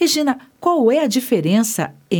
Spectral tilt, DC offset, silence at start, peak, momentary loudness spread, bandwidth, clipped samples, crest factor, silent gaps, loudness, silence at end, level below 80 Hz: -4.5 dB/octave; under 0.1%; 0 s; -4 dBFS; 6 LU; over 20 kHz; under 0.1%; 14 dB; none; -17 LUFS; 0 s; -68 dBFS